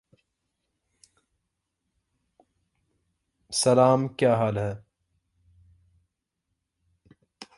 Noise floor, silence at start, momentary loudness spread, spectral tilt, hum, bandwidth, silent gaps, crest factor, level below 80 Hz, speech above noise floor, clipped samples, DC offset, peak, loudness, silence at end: -82 dBFS; 3.5 s; 13 LU; -5 dB/octave; none; 11.5 kHz; none; 24 dB; -62 dBFS; 60 dB; under 0.1%; under 0.1%; -6 dBFS; -23 LUFS; 0.15 s